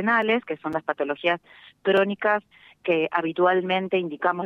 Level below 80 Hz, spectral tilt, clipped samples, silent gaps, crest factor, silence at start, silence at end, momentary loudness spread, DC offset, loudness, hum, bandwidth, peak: -70 dBFS; -7 dB/octave; under 0.1%; none; 18 dB; 0 s; 0 s; 7 LU; under 0.1%; -24 LUFS; none; 6 kHz; -6 dBFS